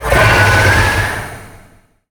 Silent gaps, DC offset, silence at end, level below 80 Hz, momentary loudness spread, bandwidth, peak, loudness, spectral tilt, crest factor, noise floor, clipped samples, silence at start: none; under 0.1%; 0.6 s; -24 dBFS; 14 LU; over 20 kHz; 0 dBFS; -10 LUFS; -4.5 dB/octave; 12 dB; -46 dBFS; under 0.1%; 0 s